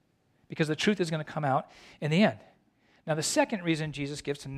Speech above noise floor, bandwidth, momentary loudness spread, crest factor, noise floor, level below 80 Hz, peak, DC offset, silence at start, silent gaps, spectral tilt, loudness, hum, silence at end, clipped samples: 40 dB; 14 kHz; 14 LU; 18 dB; -69 dBFS; -66 dBFS; -12 dBFS; under 0.1%; 0.5 s; none; -5 dB/octave; -29 LUFS; none; 0 s; under 0.1%